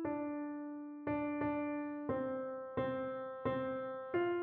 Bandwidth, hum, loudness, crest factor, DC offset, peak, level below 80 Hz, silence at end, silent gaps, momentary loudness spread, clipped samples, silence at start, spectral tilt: 4.2 kHz; none; -40 LUFS; 16 dB; under 0.1%; -24 dBFS; -68 dBFS; 0 s; none; 5 LU; under 0.1%; 0 s; -6 dB/octave